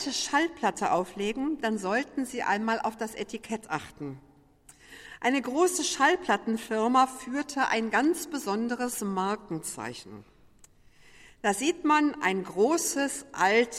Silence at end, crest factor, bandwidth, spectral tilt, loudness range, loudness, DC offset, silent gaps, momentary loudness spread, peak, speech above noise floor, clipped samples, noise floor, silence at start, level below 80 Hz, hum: 0 s; 18 dB; 16 kHz; -3 dB/octave; 6 LU; -28 LUFS; under 0.1%; none; 12 LU; -10 dBFS; 29 dB; under 0.1%; -57 dBFS; 0 s; -64 dBFS; none